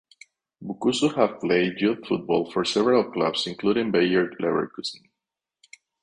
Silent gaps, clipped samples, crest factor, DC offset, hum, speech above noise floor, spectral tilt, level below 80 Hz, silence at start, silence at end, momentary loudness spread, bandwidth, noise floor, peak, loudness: none; under 0.1%; 20 dB; under 0.1%; none; 63 dB; -5 dB/octave; -64 dBFS; 0.6 s; 1.05 s; 8 LU; 10.5 kHz; -87 dBFS; -6 dBFS; -24 LUFS